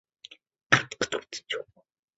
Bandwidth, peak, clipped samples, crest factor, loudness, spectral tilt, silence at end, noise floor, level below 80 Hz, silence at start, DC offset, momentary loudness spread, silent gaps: 8 kHz; -2 dBFS; under 0.1%; 30 dB; -28 LUFS; -1.5 dB/octave; 0.55 s; -67 dBFS; -64 dBFS; 0.7 s; under 0.1%; 25 LU; none